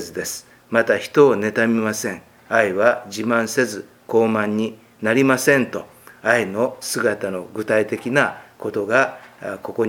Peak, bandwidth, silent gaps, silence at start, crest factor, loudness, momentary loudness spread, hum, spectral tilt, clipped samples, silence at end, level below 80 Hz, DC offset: 0 dBFS; 18 kHz; none; 0 s; 20 dB; -20 LUFS; 13 LU; none; -4.5 dB/octave; under 0.1%; 0 s; -66 dBFS; under 0.1%